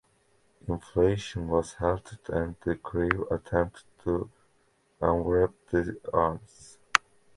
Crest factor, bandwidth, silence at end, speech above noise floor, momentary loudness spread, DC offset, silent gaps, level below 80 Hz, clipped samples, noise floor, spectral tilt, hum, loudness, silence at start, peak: 28 dB; 11.5 kHz; 0.4 s; 39 dB; 9 LU; under 0.1%; none; -46 dBFS; under 0.1%; -68 dBFS; -6 dB/octave; none; -29 LUFS; 0.65 s; -2 dBFS